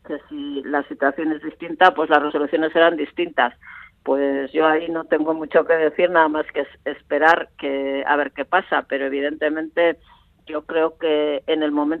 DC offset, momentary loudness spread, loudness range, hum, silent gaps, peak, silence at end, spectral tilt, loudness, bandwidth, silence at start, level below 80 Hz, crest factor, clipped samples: under 0.1%; 12 LU; 3 LU; none; none; 0 dBFS; 0 s; -6 dB/octave; -20 LUFS; 6.8 kHz; 0.1 s; -62 dBFS; 20 dB; under 0.1%